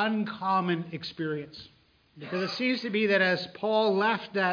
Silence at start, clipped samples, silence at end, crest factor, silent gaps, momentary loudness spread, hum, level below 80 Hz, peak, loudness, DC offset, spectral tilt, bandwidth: 0 s; under 0.1%; 0 s; 16 dB; none; 13 LU; none; -72 dBFS; -12 dBFS; -28 LUFS; under 0.1%; -6.5 dB/octave; 5.2 kHz